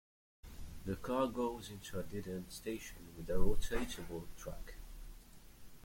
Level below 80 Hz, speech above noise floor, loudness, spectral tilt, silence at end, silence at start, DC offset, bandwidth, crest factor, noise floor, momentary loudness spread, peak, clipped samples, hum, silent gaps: -46 dBFS; 21 dB; -42 LUFS; -5.5 dB/octave; 0 s; 0.45 s; under 0.1%; 16.5 kHz; 20 dB; -56 dBFS; 21 LU; -18 dBFS; under 0.1%; none; none